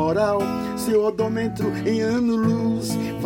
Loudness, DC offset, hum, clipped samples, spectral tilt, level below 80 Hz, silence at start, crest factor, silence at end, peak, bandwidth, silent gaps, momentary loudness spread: -22 LUFS; under 0.1%; none; under 0.1%; -6.5 dB/octave; -50 dBFS; 0 s; 14 dB; 0 s; -8 dBFS; 17 kHz; none; 4 LU